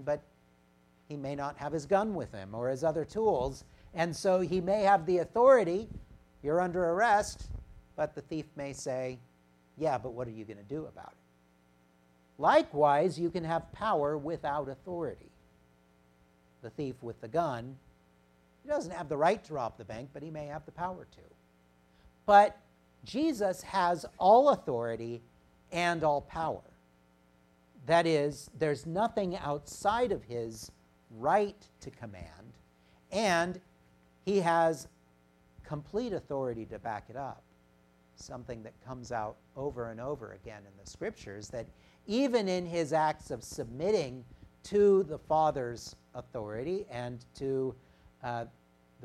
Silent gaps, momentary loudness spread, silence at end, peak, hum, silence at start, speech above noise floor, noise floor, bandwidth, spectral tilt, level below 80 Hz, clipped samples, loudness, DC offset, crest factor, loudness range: none; 20 LU; 0 s; -10 dBFS; 60 Hz at -65 dBFS; 0 s; 35 dB; -66 dBFS; 14.5 kHz; -5.5 dB/octave; -60 dBFS; under 0.1%; -31 LUFS; under 0.1%; 24 dB; 12 LU